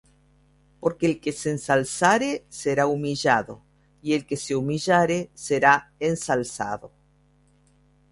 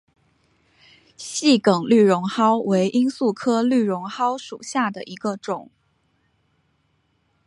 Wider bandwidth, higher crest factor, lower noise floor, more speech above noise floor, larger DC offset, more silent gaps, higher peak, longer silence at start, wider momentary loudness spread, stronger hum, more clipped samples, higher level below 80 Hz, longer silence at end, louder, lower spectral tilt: about the same, 11.5 kHz vs 11.5 kHz; about the same, 22 dB vs 18 dB; second, -61 dBFS vs -67 dBFS; second, 37 dB vs 47 dB; neither; neither; about the same, -2 dBFS vs -4 dBFS; second, 0.8 s vs 1.2 s; second, 9 LU vs 13 LU; neither; neither; first, -58 dBFS vs -70 dBFS; second, 1.25 s vs 1.85 s; about the same, -23 LUFS vs -21 LUFS; about the same, -4.5 dB/octave vs -5 dB/octave